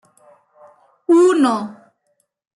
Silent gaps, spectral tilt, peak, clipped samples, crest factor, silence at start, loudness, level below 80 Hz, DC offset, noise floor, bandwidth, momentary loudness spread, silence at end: none; -5 dB/octave; -4 dBFS; under 0.1%; 14 dB; 1.1 s; -15 LUFS; -76 dBFS; under 0.1%; -68 dBFS; 11.5 kHz; 19 LU; 0.85 s